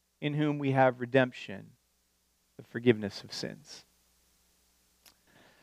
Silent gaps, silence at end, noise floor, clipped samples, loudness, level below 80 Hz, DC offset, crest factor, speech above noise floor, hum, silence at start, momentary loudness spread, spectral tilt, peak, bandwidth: none; 1.85 s; -73 dBFS; under 0.1%; -30 LUFS; -76 dBFS; under 0.1%; 24 dB; 43 dB; none; 0.2 s; 21 LU; -6.5 dB/octave; -10 dBFS; 15 kHz